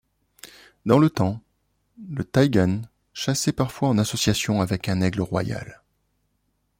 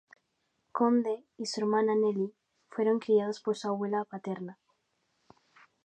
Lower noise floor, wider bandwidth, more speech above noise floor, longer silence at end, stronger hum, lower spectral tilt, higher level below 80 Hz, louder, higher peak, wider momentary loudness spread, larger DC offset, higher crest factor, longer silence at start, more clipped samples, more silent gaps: second, -71 dBFS vs -78 dBFS; first, 16.5 kHz vs 9.2 kHz; about the same, 49 dB vs 49 dB; second, 1.05 s vs 1.3 s; first, 50 Hz at -50 dBFS vs none; about the same, -5.5 dB/octave vs -6 dB/octave; first, -52 dBFS vs -86 dBFS; first, -23 LUFS vs -30 LUFS; first, -4 dBFS vs -14 dBFS; first, 15 LU vs 12 LU; neither; about the same, 20 dB vs 18 dB; second, 0.45 s vs 0.75 s; neither; neither